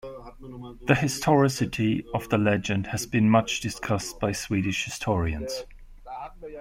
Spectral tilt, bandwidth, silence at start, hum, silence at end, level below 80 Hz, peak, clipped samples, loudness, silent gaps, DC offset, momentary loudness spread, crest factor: -5.5 dB/octave; 16.5 kHz; 0.05 s; none; 0 s; -46 dBFS; -4 dBFS; under 0.1%; -25 LUFS; none; under 0.1%; 19 LU; 22 dB